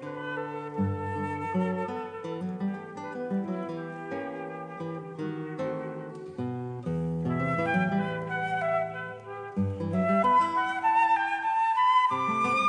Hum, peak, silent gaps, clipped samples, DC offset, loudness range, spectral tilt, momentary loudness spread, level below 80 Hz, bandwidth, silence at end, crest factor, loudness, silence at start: none; -14 dBFS; none; under 0.1%; under 0.1%; 10 LU; -7 dB/octave; 14 LU; -64 dBFS; 10 kHz; 0 s; 16 dB; -29 LUFS; 0 s